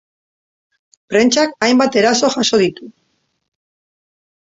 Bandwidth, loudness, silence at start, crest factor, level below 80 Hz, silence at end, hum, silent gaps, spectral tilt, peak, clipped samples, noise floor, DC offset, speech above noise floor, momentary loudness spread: 8 kHz; -14 LUFS; 1.1 s; 16 dB; -60 dBFS; 1.6 s; none; none; -3 dB/octave; -2 dBFS; under 0.1%; -66 dBFS; under 0.1%; 52 dB; 4 LU